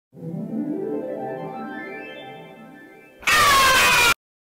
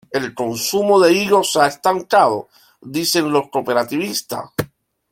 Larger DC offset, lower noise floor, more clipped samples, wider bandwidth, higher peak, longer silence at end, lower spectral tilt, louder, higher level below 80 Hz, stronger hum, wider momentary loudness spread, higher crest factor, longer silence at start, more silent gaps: neither; first, -46 dBFS vs -38 dBFS; neither; about the same, 16.5 kHz vs 16.5 kHz; second, -10 dBFS vs -2 dBFS; about the same, 0.4 s vs 0.45 s; second, -1.5 dB/octave vs -3.5 dB/octave; about the same, -18 LUFS vs -17 LUFS; first, -48 dBFS vs -56 dBFS; neither; first, 21 LU vs 13 LU; about the same, 12 dB vs 16 dB; about the same, 0.15 s vs 0.1 s; neither